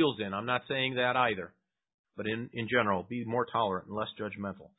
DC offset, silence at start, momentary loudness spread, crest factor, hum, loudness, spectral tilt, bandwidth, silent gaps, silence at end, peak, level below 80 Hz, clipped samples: under 0.1%; 0 s; 10 LU; 20 dB; none; -32 LUFS; -9 dB/octave; 4 kHz; 1.94-2.04 s; 0.1 s; -12 dBFS; -64 dBFS; under 0.1%